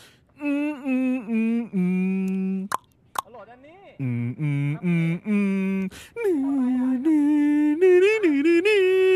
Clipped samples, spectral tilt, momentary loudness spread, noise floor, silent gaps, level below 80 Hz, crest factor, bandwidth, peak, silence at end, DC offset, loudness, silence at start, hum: under 0.1%; -7.5 dB/octave; 13 LU; -48 dBFS; none; -66 dBFS; 16 dB; 14 kHz; -6 dBFS; 0 s; under 0.1%; -23 LUFS; 0.4 s; none